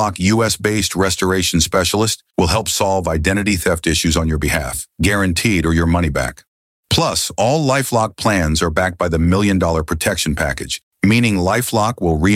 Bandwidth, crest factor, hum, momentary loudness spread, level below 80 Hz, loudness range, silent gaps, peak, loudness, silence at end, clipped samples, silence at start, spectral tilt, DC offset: 16.5 kHz; 14 dB; none; 4 LU; -30 dBFS; 1 LU; 6.48-6.83 s, 10.83-10.91 s; -2 dBFS; -16 LUFS; 0 s; under 0.1%; 0 s; -4.5 dB/octave; under 0.1%